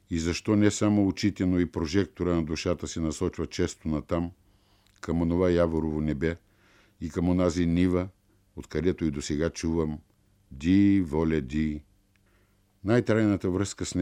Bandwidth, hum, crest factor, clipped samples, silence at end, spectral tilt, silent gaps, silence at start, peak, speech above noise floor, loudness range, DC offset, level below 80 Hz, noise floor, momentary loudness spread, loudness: 12 kHz; none; 18 dB; under 0.1%; 0 s; -6.5 dB/octave; none; 0.1 s; -8 dBFS; 39 dB; 3 LU; under 0.1%; -44 dBFS; -65 dBFS; 10 LU; -27 LUFS